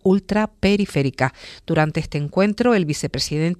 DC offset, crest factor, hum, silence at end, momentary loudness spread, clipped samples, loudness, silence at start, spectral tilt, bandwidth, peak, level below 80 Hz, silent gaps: under 0.1%; 16 dB; none; 0.05 s; 6 LU; under 0.1%; -20 LUFS; 0.05 s; -6 dB/octave; 13.5 kHz; -4 dBFS; -42 dBFS; none